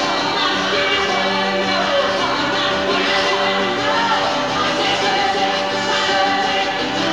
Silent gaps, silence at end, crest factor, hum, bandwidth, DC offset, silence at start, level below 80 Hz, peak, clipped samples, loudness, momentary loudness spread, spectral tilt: none; 0 s; 12 dB; none; 16.5 kHz; 0.3%; 0 s; -50 dBFS; -6 dBFS; under 0.1%; -17 LUFS; 2 LU; -3 dB/octave